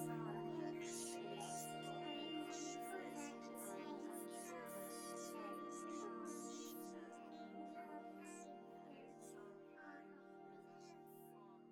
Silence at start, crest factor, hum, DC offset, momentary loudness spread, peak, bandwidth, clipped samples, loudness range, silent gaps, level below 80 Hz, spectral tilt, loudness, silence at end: 0 s; 16 dB; none; under 0.1%; 12 LU; -36 dBFS; 18 kHz; under 0.1%; 9 LU; none; under -90 dBFS; -4 dB/octave; -52 LUFS; 0 s